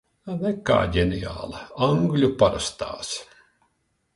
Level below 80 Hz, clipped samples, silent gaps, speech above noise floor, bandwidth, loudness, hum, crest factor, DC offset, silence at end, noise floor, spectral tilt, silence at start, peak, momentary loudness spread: -42 dBFS; under 0.1%; none; 48 dB; 11.5 kHz; -24 LUFS; none; 20 dB; under 0.1%; 0.9 s; -71 dBFS; -5.5 dB/octave; 0.25 s; -4 dBFS; 13 LU